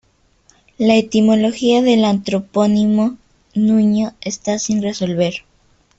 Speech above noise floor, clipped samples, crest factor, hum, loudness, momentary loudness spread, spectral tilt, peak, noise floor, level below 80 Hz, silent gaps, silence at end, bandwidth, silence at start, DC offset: 41 dB; under 0.1%; 16 dB; none; -16 LUFS; 8 LU; -5.5 dB/octave; -2 dBFS; -56 dBFS; -54 dBFS; none; 0.6 s; 8 kHz; 0.8 s; under 0.1%